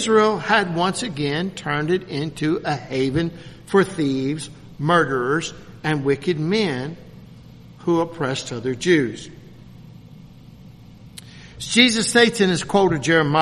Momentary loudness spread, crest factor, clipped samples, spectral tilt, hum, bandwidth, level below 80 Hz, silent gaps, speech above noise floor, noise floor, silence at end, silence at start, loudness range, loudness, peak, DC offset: 16 LU; 22 dB; under 0.1%; -4.5 dB/octave; none; 13 kHz; -52 dBFS; none; 23 dB; -43 dBFS; 0 s; 0 s; 5 LU; -20 LUFS; 0 dBFS; under 0.1%